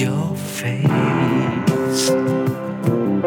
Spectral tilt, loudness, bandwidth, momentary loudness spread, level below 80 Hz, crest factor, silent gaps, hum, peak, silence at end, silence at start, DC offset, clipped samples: -6 dB/octave; -19 LUFS; 19 kHz; 6 LU; -56 dBFS; 14 dB; none; none; -4 dBFS; 0 s; 0 s; under 0.1%; under 0.1%